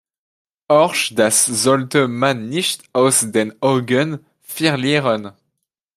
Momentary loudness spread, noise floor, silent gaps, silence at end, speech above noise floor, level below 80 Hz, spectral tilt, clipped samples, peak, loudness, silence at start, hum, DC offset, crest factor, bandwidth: 8 LU; -76 dBFS; none; 0.65 s; 59 dB; -62 dBFS; -3.5 dB/octave; under 0.1%; 0 dBFS; -16 LUFS; 0.7 s; none; under 0.1%; 18 dB; 15.5 kHz